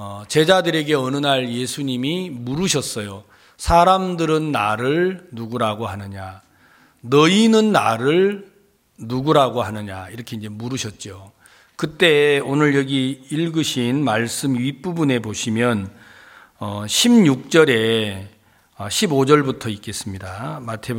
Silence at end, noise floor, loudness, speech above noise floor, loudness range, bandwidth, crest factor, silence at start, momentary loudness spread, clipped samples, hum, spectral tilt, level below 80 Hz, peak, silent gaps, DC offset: 0 s; -57 dBFS; -18 LUFS; 38 dB; 4 LU; 17 kHz; 18 dB; 0 s; 17 LU; under 0.1%; none; -4.5 dB/octave; -46 dBFS; -2 dBFS; none; under 0.1%